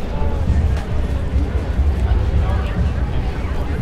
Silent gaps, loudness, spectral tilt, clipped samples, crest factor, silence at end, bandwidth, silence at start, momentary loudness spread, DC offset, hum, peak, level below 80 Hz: none; -20 LUFS; -8 dB/octave; under 0.1%; 12 dB; 0 s; 8.4 kHz; 0 s; 5 LU; under 0.1%; none; -4 dBFS; -20 dBFS